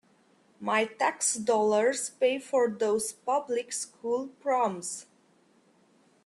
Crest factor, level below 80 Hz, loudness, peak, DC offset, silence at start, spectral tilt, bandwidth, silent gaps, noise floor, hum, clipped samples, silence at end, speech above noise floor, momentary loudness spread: 18 dB; -78 dBFS; -28 LUFS; -12 dBFS; under 0.1%; 0.6 s; -2.5 dB/octave; 12.5 kHz; none; -64 dBFS; none; under 0.1%; 1.25 s; 36 dB; 9 LU